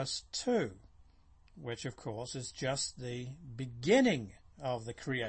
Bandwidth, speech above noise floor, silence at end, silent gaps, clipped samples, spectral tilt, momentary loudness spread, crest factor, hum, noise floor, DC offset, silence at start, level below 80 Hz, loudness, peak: 8.8 kHz; 27 dB; 0 s; none; under 0.1%; -4.5 dB/octave; 16 LU; 20 dB; none; -62 dBFS; under 0.1%; 0 s; -62 dBFS; -35 LUFS; -16 dBFS